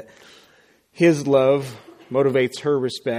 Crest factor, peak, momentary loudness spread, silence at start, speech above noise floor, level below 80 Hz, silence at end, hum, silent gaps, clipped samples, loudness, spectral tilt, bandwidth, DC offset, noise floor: 18 dB; -4 dBFS; 7 LU; 1 s; 38 dB; -64 dBFS; 0 s; none; none; under 0.1%; -20 LUFS; -6 dB/octave; 15.5 kHz; under 0.1%; -57 dBFS